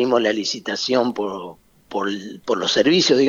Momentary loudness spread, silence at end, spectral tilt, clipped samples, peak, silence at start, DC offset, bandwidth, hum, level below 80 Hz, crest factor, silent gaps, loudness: 14 LU; 0 s; -3.5 dB/octave; under 0.1%; -2 dBFS; 0 s; under 0.1%; 7.6 kHz; none; -64 dBFS; 16 dB; none; -20 LUFS